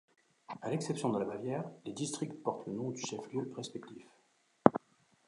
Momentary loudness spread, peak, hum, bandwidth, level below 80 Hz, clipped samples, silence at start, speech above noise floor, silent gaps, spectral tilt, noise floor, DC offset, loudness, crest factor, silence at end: 16 LU; -2 dBFS; none; 11 kHz; -74 dBFS; under 0.1%; 0.5 s; 33 dB; none; -5.5 dB/octave; -71 dBFS; under 0.1%; -36 LUFS; 34 dB; 0.5 s